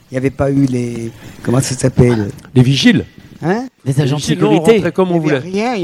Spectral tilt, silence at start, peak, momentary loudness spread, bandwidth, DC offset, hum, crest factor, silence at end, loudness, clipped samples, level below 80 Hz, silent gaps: -6 dB/octave; 0.1 s; 0 dBFS; 11 LU; 13.5 kHz; under 0.1%; none; 14 dB; 0 s; -14 LUFS; 0.1%; -40 dBFS; none